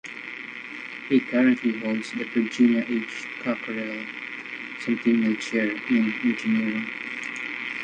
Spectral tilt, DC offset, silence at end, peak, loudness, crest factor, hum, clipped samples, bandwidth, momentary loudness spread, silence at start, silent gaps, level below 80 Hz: -5.5 dB/octave; under 0.1%; 0 s; -8 dBFS; -26 LUFS; 16 dB; none; under 0.1%; 9 kHz; 13 LU; 0.05 s; none; -70 dBFS